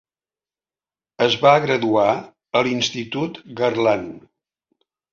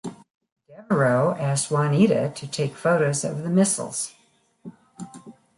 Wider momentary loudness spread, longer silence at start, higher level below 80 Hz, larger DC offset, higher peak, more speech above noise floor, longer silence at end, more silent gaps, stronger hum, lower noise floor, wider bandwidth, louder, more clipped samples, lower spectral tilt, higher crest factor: second, 12 LU vs 21 LU; first, 1.2 s vs 0.05 s; about the same, -62 dBFS vs -66 dBFS; neither; first, -2 dBFS vs -6 dBFS; first, over 71 dB vs 33 dB; first, 0.95 s vs 0.25 s; second, none vs 0.34-0.41 s, 0.52-0.56 s; neither; first, under -90 dBFS vs -55 dBFS; second, 7.4 kHz vs 11.5 kHz; first, -19 LUFS vs -22 LUFS; neither; about the same, -4.5 dB/octave vs -5.5 dB/octave; about the same, 20 dB vs 18 dB